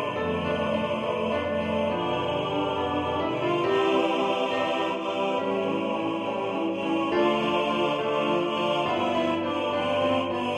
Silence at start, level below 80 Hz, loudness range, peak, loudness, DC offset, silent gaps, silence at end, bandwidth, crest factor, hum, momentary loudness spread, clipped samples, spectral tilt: 0 s; -58 dBFS; 2 LU; -12 dBFS; -26 LUFS; under 0.1%; none; 0 s; 11 kHz; 14 dB; none; 4 LU; under 0.1%; -6 dB/octave